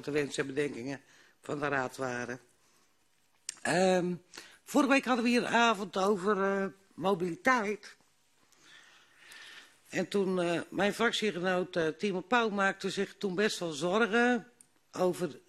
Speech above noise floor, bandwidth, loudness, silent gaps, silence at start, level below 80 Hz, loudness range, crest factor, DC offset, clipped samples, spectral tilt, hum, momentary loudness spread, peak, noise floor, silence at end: 42 dB; 13 kHz; -31 LUFS; none; 0 s; -72 dBFS; 7 LU; 20 dB; under 0.1%; under 0.1%; -4.5 dB/octave; none; 15 LU; -12 dBFS; -73 dBFS; 0.1 s